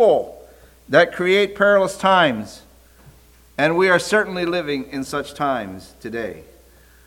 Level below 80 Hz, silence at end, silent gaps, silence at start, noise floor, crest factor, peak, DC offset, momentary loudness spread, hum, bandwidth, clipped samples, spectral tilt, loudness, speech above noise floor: -52 dBFS; 0.65 s; none; 0 s; -50 dBFS; 18 dB; -2 dBFS; under 0.1%; 16 LU; none; 18 kHz; under 0.1%; -4.5 dB/octave; -19 LUFS; 31 dB